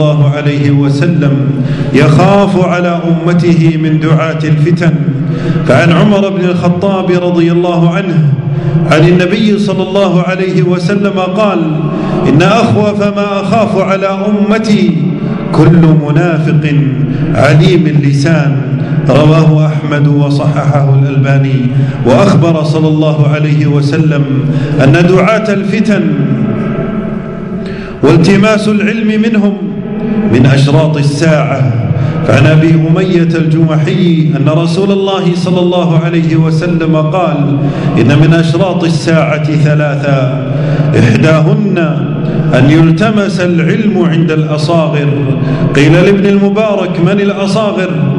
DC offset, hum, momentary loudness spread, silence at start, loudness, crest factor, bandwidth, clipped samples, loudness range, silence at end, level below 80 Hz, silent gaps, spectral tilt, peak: under 0.1%; none; 6 LU; 0 s; -9 LUFS; 8 dB; 10.5 kHz; 3%; 2 LU; 0 s; -36 dBFS; none; -7.5 dB/octave; 0 dBFS